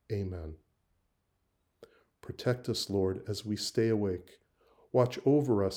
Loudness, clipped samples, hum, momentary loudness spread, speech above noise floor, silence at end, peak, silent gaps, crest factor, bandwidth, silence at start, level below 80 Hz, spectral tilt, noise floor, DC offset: -31 LUFS; under 0.1%; none; 15 LU; 47 dB; 0 s; -12 dBFS; none; 20 dB; over 20 kHz; 0.1 s; -62 dBFS; -6 dB/octave; -78 dBFS; under 0.1%